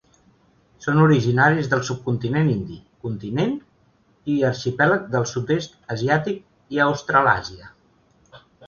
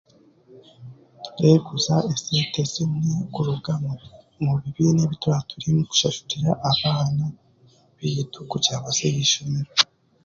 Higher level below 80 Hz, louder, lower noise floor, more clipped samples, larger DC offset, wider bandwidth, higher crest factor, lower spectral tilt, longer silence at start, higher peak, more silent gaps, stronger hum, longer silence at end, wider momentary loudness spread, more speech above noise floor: about the same, -54 dBFS vs -56 dBFS; about the same, -21 LUFS vs -22 LUFS; first, -60 dBFS vs -56 dBFS; neither; neither; about the same, 7.2 kHz vs 7.6 kHz; about the same, 20 dB vs 22 dB; first, -6.5 dB/octave vs -4.5 dB/octave; first, 0.8 s vs 0.5 s; about the same, -2 dBFS vs -2 dBFS; neither; neither; second, 0 s vs 0.4 s; first, 14 LU vs 8 LU; first, 39 dB vs 34 dB